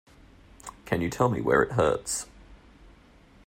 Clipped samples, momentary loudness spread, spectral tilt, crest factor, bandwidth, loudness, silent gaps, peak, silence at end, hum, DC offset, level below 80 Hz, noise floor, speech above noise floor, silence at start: under 0.1%; 22 LU; -5 dB/octave; 20 dB; 16 kHz; -26 LUFS; none; -8 dBFS; 0.9 s; none; under 0.1%; -52 dBFS; -55 dBFS; 30 dB; 0.65 s